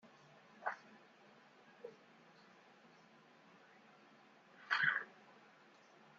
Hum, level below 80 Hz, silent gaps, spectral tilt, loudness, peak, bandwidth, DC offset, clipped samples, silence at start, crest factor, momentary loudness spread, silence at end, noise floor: none; under -90 dBFS; none; 0.5 dB/octave; -40 LUFS; -20 dBFS; 7.4 kHz; under 0.1%; under 0.1%; 0.6 s; 28 dB; 28 LU; 1.1 s; -66 dBFS